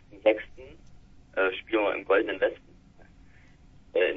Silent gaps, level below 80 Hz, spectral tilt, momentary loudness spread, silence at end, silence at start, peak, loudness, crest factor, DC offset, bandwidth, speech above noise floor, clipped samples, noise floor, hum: none; -58 dBFS; -6 dB/octave; 11 LU; 0 s; 0.15 s; -10 dBFS; -27 LUFS; 20 dB; under 0.1%; 5.6 kHz; 27 dB; under 0.1%; -54 dBFS; none